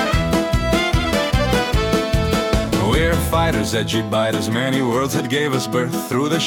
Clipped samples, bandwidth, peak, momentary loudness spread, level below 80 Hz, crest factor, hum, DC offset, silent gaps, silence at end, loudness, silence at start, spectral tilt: under 0.1%; 18 kHz; -6 dBFS; 2 LU; -28 dBFS; 12 dB; none; under 0.1%; none; 0 s; -18 LUFS; 0 s; -5 dB/octave